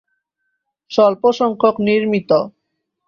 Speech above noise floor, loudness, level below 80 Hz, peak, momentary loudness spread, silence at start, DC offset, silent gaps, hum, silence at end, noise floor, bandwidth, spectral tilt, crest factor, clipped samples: 59 dB; -16 LUFS; -60 dBFS; -2 dBFS; 5 LU; 0.9 s; under 0.1%; none; none; 0.6 s; -74 dBFS; 7.2 kHz; -6.5 dB/octave; 16 dB; under 0.1%